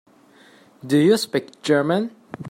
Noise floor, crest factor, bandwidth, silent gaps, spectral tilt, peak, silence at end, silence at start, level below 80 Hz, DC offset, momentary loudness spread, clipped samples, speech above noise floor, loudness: -52 dBFS; 16 dB; 16 kHz; none; -5.5 dB/octave; -6 dBFS; 0 s; 0.85 s; -66 dBFS; under 0.1%; 17 LU; under 0.1%; 32 dB; -20 LUFS